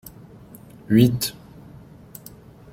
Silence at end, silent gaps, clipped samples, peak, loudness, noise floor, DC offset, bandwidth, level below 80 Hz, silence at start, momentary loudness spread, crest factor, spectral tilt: 1.4 s; none; under 0.1%; -2 dBFS; -20 LUFS; -45 dBFS; under 0.1%; 16.5 kHz; -52 dBFS; 0.9 s; 27 LU; 22 dB; -6 dB/octave